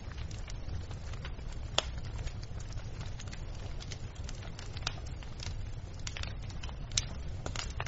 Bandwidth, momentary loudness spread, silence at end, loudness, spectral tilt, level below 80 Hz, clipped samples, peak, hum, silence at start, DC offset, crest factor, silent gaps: 8 kHz; 9 LU; 0 s; -41 LUFS; -3.5 dB/octave; -42 dBFS; under 0.1%; -6 dBFS; none; 0 s; under 0.1%; 34 dB; none